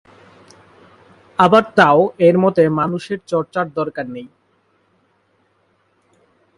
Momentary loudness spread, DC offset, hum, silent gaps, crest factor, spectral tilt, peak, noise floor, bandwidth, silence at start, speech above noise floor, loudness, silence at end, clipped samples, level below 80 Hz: 15 LU; under 0.1%; none; none; 18 dB; -7 dB/octave; 0 dBFS; -61 dBFS; 11 kHz; 1.4 s; 46 dB; -15 LUFS; 2.3 s; under 0.1%; -60 dBFS